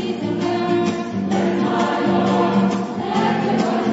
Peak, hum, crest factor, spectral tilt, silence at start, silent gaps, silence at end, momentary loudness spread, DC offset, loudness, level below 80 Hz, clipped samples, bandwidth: -6 dBFS; none; 14 dB; -6.5 dB/octave; 0 s; none; 0 s; 5 LU; under 0.1%; -19 LUFS; -58 dBFS; under 0.1%; 8 kHz